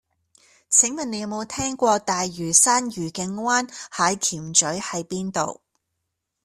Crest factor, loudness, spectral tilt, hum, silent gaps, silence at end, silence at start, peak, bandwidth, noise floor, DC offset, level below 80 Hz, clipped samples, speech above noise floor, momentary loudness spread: 22 dB; -21 LUFS; -2 dB/octave; none; none; 0.9 s; 0.7 s; -2 dBFS; 14 kHz; -79 dBFS; under 0.1%; -60 dBFS; under 0.1%; 57 dB; 12 LU